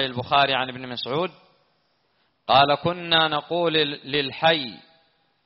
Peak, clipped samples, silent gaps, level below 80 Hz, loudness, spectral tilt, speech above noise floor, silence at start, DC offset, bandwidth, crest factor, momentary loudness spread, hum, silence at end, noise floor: -4 dBFS; under 0.1%; none; -60 dBFS; -22 LUFS; -1.5 dB/octave; 46 dB; 0 s; under 0.1%; 5.8 kHz; 20 dB; 12 LU; none; 0.7 s; -68 dBFS